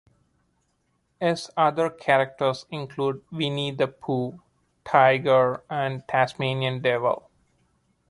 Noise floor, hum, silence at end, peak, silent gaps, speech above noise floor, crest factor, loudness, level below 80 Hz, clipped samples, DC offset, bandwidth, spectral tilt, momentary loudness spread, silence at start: -71 dBFS; none; 0.9 s; -4 dBFS; none; 47 dB; 22 dB; -24 LUFS; -66 dBFS; under 0.1%; under 0.1%; 11.5 kHz; -6 dB/octave; 10 LU; 1.2 s